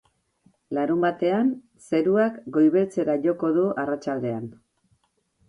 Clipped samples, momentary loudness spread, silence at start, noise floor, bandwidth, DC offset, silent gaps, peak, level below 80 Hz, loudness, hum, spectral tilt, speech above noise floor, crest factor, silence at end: under 0.1%; 10 LU; 0.7 s; -68 dBFS; 11 kHz; under 0.1%; none; -8 dBFS; -68 dBFS; -24 LUFS; none; -8 dB/octave; 45 dB; 16 dB; 0.95 s